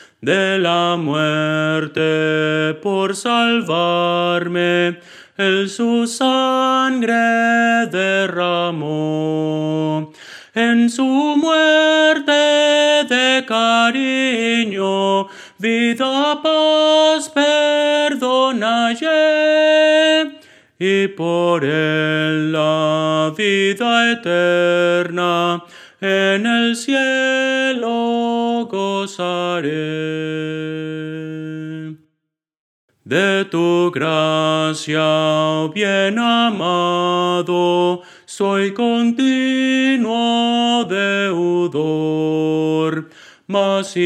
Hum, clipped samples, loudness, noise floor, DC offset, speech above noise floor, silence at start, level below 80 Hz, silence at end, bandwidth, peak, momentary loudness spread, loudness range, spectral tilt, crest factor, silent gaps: none; under 0.1%; -16 LUFS; -76 dBFS; under 0.1%; 60 dB; 0 s; -74 dBFS; 0 s; 13 kHz; -2 dBFS; 8 LU; 5 LU; -4.5 dB/octave; 16 dB; 32.59-32.88 s